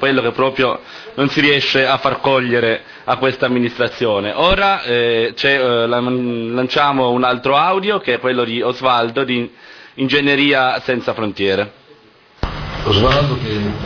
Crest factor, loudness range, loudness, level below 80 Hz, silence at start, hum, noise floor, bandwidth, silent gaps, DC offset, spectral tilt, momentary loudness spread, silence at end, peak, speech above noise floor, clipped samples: 14 dB; 2 LU; -15 LUFS; -36 dBFS; 0 s; none; -47 dBFS; 5.4 kHz; none; under 0.1%; -6 dB/octave; 8 LU; 0 s; -2 dBFS; 31 dB; under 0.1%